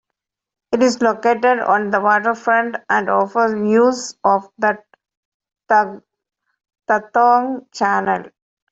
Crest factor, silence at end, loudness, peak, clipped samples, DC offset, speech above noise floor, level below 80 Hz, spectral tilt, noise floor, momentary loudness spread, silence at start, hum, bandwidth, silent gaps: 16 dB; 0.45 s; -17 LUFS; -2 dBFS; under 0.1%; under 0.1%; 65 dB; -64 dBFS; -4.5 dB/octave; -81 dBFS; 7 LU; 0.7 s; none; 8.2 kHz; 5.17-5.40 s